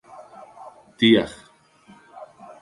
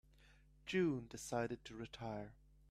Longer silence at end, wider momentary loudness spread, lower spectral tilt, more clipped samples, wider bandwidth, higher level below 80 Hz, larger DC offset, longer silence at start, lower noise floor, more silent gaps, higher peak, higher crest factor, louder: about the same, 0.35 s vs 0.35 s; first, 27 LU vs 14 LU; about the same, -5.5 dB/octave vs -5.5 dB/octave; neither; second, 11.5 kHz vs 14 kHz; first, -60 dBFS vs -68 dBFS; neither; first, 0.65 s vs 0.25 s; second, -54 dBFS vs -67 dBFS; neither; first, -2 dBFS vs -26 dBFS; about the same, 22 dB vs 18 dB; first, -19 LUFS vs -43 LUFS